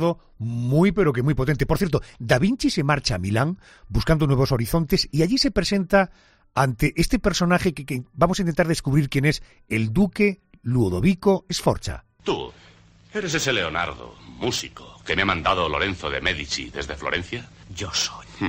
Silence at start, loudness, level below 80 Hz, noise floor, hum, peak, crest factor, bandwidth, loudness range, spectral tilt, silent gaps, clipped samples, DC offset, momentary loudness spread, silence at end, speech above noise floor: 0 s; -23 LUFS; -38 dBFS; -51 dBFS; none; -4 dBFS; 18 dB; 15.5 kHz; 4 LU; -5.5 dB/octave; none; under 0.1%; under 0.1%; 11 LU; 0 s; 29 dB